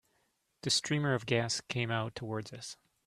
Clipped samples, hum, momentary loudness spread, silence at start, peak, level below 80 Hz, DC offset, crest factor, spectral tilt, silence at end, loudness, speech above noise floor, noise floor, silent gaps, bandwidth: under 0.1%; none; 14 LU; 0.65 s; -12 dBFS; -68 dBFS; under 0.1%; 22 dB; -4 dB/octave; 0.35 s; -33 LUFS; 43 dB; -76 dBFS; none; 14 kHz